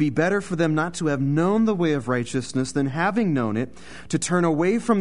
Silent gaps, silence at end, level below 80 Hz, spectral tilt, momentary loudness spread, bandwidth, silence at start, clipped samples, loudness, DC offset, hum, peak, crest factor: none; 0 s; -54 dBFS; -6 dB/octave; 6 LU; 11 kHz; 0 s; under 0.1%; -23 LUFS; 0.8%; none; -8 dBFS; 14 dB